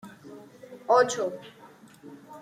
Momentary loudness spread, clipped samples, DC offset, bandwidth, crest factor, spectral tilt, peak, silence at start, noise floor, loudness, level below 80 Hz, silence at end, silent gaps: 26 LU; under 0.1%; under 0.1%; 14.5 kHz; 22 dB; -3 dB/octave; -8 dBFS; 0.05 s; -51 dBFS; -25 LUFS; -78 dBFS; 0 s; none